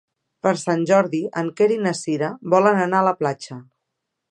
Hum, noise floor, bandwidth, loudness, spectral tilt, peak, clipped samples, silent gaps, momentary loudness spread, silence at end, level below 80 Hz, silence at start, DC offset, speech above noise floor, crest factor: none; -79 dBFS; 11.5 kHz; -20 LUFS; -6 dB/octave; -2 dBFS; under 0.1%; none; 9 LU; 0.7 s; -72 dBFS; 0.45 s; under 0.1%; 60 dB; 18 dB